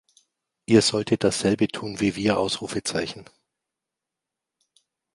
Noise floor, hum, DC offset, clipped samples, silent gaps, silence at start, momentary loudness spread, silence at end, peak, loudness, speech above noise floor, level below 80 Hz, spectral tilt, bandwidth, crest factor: -86 dBFS; none; under 0.1%; under 0.1%; none; 0.7 s; 11 LU; 1.9 s; -4 dBFS; -23 LUFS; 63 dB; -56 dBFS; -4.5 dB/octave; 11.5 kHz; 22 dB